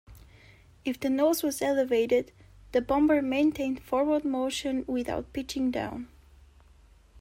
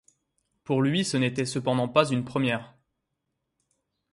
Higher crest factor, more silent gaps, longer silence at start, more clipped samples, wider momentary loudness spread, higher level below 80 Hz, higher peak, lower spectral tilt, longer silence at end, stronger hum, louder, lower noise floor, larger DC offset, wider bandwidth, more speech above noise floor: second, 16 dB vs 24 dB; neither; second, 0.1 s vs 0.7 s; neither; first, 11 LU vs 5 LU; first, -54 dBFS vs -66 dBFS; second, -14 dBFS vs -6 dBFS; about the same, -4.5 dB/octave vs -5.5 dB/octave; second, 0 s vs 1.45 s; neither; about the same, -28 LUFS vs -26 LUFS; second, -57 dBFS vs -81 dBFS; neither; first, 16 kHz vs 11.5 kHz; second, 30 dB vs 56 dB